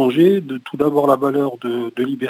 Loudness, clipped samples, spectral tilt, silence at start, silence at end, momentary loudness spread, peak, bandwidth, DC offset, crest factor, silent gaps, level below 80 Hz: -17 LUFS; under 0.1%; -7.5 dB/octave; 0 s; 0 s; 9 LU; -2 dBFS; 16 kHz; under 0.1%; 16 dB; none; -66 dBFS